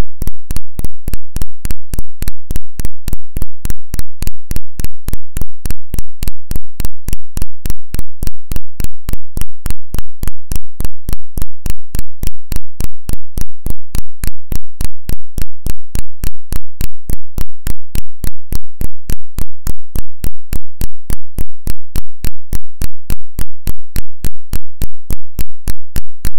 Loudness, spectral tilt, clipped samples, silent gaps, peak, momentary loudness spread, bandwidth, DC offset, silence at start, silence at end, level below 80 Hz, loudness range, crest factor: -27 LUFS; -5 dB/octave; 20%; none; 0 dBFS; 3 LU; 17 kHz; under 0.1%; 0 s; 0 s; -22 dBFS; 1 LU; 4 dB